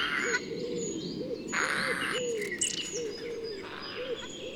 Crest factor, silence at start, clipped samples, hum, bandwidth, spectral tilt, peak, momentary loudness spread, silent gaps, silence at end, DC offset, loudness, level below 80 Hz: 18 dB; 0 s; under 0.1%; none; 18.5 kHz; -2 dB/octave; -14 dBFS; 9 LU; none; 0 s; under 0.1%; -32 LUFS; -62 dBFS